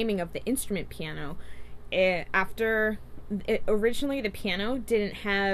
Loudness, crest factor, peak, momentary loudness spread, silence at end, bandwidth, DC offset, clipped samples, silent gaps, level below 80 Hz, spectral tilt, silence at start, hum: -29 LUFS; 16 dB; -12 dBFS; 11 LU; 0 s; 14 kHz; under 0.1%; under 0.1%; none; -44 dBFS; -4.5 dB/octave; 0 s; 60 Hz at -50 dBFS